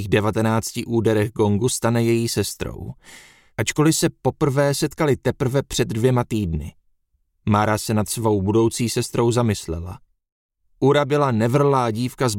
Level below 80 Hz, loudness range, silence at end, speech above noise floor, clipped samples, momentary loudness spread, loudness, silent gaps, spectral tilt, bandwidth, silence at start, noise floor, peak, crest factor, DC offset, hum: -44 dBFS; 1 LU; 0 s; 47 dB; under 0.1%; 10 LU; -20 LUFS; 10.32-10.49 s; -5.5 dB/octave; 17 kHz; 0 s; -67 dBFS; -2 dBFS; 18 dB; under 0.1%; none